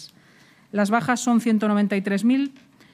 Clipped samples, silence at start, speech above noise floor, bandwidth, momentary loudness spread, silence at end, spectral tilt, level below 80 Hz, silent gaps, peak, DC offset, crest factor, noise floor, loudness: under 0.1%; 0 s; 33 dB; 14.5 kHz; 5 LU; 0.4 s; -5.5 dB/octave; -74 dBFS; none; -6 dBFS; under 0.1%; 18 dB; -54 dBFS; -22 LUFS